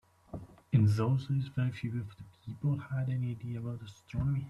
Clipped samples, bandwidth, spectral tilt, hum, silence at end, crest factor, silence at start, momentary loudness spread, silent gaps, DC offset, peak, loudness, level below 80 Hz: under 0.1%; 10.5 kHz; -8.5 dB/octave; none; 0 s; 18 dB; 0.35 s; 20 LU; none; under 0.1%; -14 dBFS; -33 LUFS; -56 dBFS